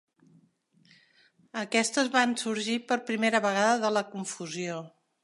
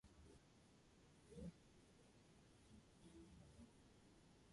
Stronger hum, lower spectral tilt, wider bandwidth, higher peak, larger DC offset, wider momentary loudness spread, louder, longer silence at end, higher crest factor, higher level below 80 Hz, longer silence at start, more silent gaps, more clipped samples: neither; second, -3 dB/octave vs -5.5 dB/octave; about the same, 11.5 kHz vs 11.5 kHz; first, -8 dBFS vs -46 dBFS; neither; about the same, 11 LU vs 10 LU; first, -28 LUFS vs -64 LUFS; first, 0.35 s vs 0 s; about the same, 22 dB vs 20 dB; second, -84 dBFS vs -74 dBFS; first, 1.55 s vs 0.05 s; neither; neither